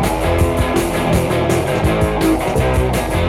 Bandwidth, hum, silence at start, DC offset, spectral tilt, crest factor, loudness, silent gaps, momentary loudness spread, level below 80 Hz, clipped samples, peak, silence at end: 16.5 kHz; none; 0 s; under 0.1%; -6 dB/octave; 12 dB; -16 LUFS; none; 1 LU; -24 dBFS; under 0.1%; -4 dBFS; 0 s